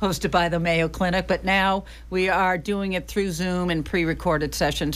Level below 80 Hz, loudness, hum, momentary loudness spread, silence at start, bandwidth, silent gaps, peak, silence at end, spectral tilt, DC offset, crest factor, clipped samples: -38 dBFS; -23 LUFS; none; 5 LU; 0 s; 15.5 kHz; none; -10 dBFS; 0 s; -5 dB/octave; under 0.1%; 14 dB; under 0.1%